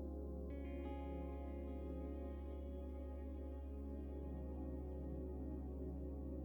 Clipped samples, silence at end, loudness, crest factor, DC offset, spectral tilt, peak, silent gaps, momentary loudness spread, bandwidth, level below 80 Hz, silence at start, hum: under 0.1%; 0 s; -49 LUFS; 10 dB; under 0.1%; -10.5 dB/octave; -36 dBFS; none; 2 LU; 17.5 kHz; -50 dBFS; 0 s; none